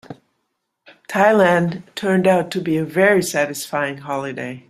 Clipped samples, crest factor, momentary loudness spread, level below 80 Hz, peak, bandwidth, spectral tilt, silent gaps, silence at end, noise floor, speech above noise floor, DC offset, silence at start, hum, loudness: under 0.1%; 18 dB; 11 LU; -62 dBFS; -2 dBFS; 15.5 kHz; -5.5 dB/octave; none; 0.1 s; -73 dBFS; 56 dB; under 0.1%; 0.1 s; none; -18 LUFS